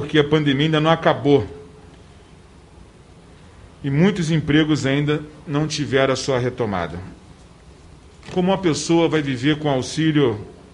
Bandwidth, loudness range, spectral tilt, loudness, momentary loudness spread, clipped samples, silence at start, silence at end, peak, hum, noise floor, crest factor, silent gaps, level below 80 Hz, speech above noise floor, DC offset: 11 kHz; 4 LU; -6 dB/octave; -19 LUFS; 10 LU; under 0.1%; 0 s; 0.2 s; -2 dBFS; none; -46 dBFS; 20 dB; none; -48 dBFS; 27 dB; under 0.1%